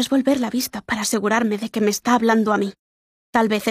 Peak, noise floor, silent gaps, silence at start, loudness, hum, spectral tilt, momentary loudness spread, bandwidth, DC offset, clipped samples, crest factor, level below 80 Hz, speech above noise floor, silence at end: -4 dBFS; under -90 dBFS; 2.79-3.33 s; 0 s; -20 LUFS; none; -4 dB/octave; 6 LU; 15.5 kHz; under 0.1%; under 0.1%; 16 dB; -58 dBFS; over 70 dB; 0 s